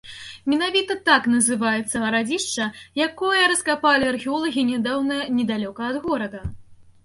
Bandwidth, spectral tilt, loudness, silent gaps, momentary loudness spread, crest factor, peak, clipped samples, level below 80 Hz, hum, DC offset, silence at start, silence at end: 11.5 kHz; -2.5 dB/octave; -21 LUFS; none; 9 LU; 18 dB; -4 dBFS; under 0.1%; -50 dBFS; none; under 0.1%; 0.05 s; 0.2 s